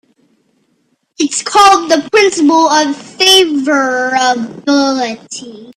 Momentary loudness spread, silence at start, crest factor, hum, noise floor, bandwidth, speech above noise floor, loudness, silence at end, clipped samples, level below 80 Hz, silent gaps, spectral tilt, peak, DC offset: 11 LU; 1.2 s; 12 dB; none; -60 dBFS; 15.5 kHz; 49 dB; -10 LUFS; 0.05 s; under 0.1%; -56 dBFS; none; -1.5 dB/octave; 0 dBFS; under 0.1%